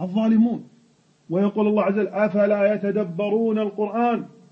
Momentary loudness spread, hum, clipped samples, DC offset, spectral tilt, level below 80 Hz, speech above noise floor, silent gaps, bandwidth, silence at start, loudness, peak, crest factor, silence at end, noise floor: 6 LU; none; under 0.1%; under 0.1%; -9 dB/octave; -68 dBFS; 38 dB; none; 5.8 kHz; 0 s; -22 LUFS; -8 dBFS; 14 dB; 0.25 s; -59 dBFS